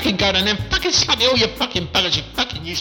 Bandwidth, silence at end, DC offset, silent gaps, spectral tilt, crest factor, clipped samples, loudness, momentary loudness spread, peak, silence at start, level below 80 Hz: 19 kHz; 0 s; under 0.1%; none; -3 dB/octave; 16 dB; under 0.1%; -17 LUFS; 7 LU; -4 dBFS; 0 s; -36 dBFS